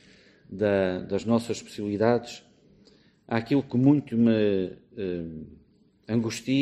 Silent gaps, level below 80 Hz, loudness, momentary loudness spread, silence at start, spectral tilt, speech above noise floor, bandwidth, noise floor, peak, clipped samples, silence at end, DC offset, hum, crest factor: none; -60 dBFS; -26 LUFS; 13 LU; 0.5 s; -7 dB/octave; 33 dB; 12.5 kHz; -59 dBFS; -8 dBFS; under 0.1%; 0 s; under 0.1%; none; 20 dB